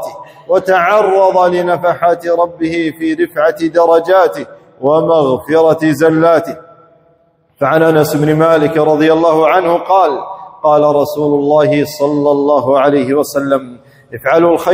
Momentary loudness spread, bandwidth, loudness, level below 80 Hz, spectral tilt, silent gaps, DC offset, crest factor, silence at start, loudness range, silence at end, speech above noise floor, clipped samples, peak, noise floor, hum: 7 LU; 16.5 kHz; -11 LUFS; -54 dBFS; -6.5 dB/octave; none; under 0.1%; 12 dB; 0 s; 2 LU; 0 s; 42 dB; under 0.1%; 0 dBFS; -53 dBFS; none